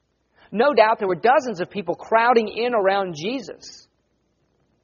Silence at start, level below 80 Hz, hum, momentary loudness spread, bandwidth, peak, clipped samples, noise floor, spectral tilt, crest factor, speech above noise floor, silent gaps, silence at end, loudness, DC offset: 0.5 s; -68 dBFS; none; 15 LU; 7.2 kHz; 0 dBFS; under 0.1%; -68 dBFS; -2.5 dB/octave; 22 dB; 48 dB; none; 1.05 s; -20 LUFS; under 0.1%